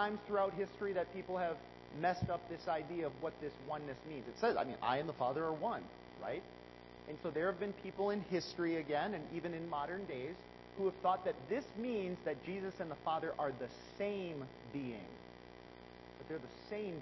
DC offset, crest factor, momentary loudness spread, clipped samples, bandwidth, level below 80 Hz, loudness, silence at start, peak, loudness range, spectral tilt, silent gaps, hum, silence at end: under 0.1%; 20 dB; 15 LU; under 0.1%; 6 kHz; -68 dBFS; -41 LUFS; 0 s; -22 dBFS; 3 LU; -4.5 dB/octave; none; 60 Hz at -65 dBFS; 0 s